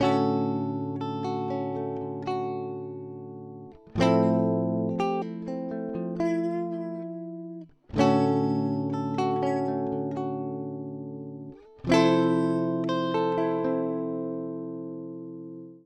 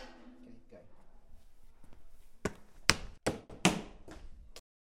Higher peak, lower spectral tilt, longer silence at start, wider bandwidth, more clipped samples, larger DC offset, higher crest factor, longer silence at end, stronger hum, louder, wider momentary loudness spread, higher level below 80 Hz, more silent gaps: second, -8 dBFS vs 0 dBFS; first, -7.5 dB/octave vs -3 dB/octave; about the same, 0 s vs 0 s; second, 9.8 kHz vs 16 kHz; neither; neither; second, 20 dB vs 40 dB; second, 0.05 s vs 0.4 s; neither; first, -28 LUFS vs -34 LUFS; second, 17 LU vs 26 LU; second, -60 dBFS vs -54 dBFS; neither